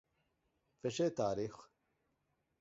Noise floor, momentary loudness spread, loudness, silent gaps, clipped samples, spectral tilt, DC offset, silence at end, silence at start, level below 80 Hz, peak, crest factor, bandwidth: -83 dBFS; 9 LU; -39 LUFS; none; under 0.1%; -5.5 dB/octave; under 0.1%; 0.95 s; 0.85 s; -74 dBFS; -22 dBFS; 20 dB; 7.6 kHz